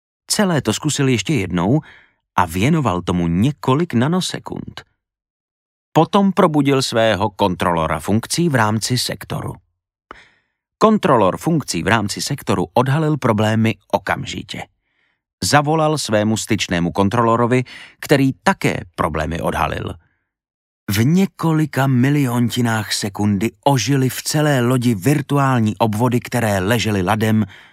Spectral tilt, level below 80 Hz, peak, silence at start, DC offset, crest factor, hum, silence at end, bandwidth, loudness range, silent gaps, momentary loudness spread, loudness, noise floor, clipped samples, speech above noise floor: -5.5 dB/octave; -44 dBFS; 0 dBFS; 0.3 s; under 0.1%; 18 dB; none; 0.2 s; 16 kHz; 3 LU; 5.30-5.92 s, 15.33-15.38 s, 20.54-20.87 s; 7 LU; -17 LUFS; -66 dBFS; under 0.1%; 49 dB